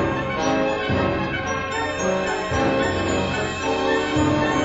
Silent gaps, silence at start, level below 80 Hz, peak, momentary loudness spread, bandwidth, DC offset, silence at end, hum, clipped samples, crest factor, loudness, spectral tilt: none; 0 s; -40 dBFS; -8 dBFS; 4 LU; 8 kHz; under 0.1%; 0 s; none; under 0.1%; 14 dB; -22 LUFS; -5 dB/octave